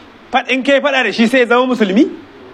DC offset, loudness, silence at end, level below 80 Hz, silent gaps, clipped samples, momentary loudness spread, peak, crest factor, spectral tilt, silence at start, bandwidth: under 0.1%; -13 LUFS; 0 s; -58 dBFS; none; under 0.1%; 6 LU; 0 dBFS; 14 dB; -5 dB/octave; 0.3 s; 13 kHz